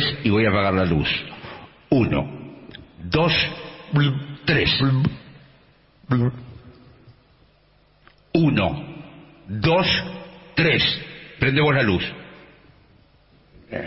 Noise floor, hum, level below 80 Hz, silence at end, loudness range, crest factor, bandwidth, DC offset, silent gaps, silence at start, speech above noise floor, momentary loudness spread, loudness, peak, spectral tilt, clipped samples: -58 dBFS; none; -44 dBFS; 0 s; 6 LU; 18 dB; 5.8 kHz; under 0.1%; none; 0 s; 38 dB; 21 LU; -21 LUFS; -6 dBFS; -9.5 dB/octave; under 0.1%